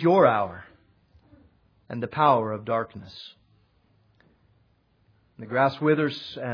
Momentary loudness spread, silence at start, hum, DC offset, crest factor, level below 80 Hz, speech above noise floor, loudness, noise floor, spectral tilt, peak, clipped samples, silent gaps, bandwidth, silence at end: 22 LU; 0 s; none; under 0.1%; 22 dB; -66 dBFS; 41 dB; -24 LUFS; -65 dBFS; -8.5 dB/octave; -4 dBFS; under 0.1%; none; 5.4 kHz; 0 s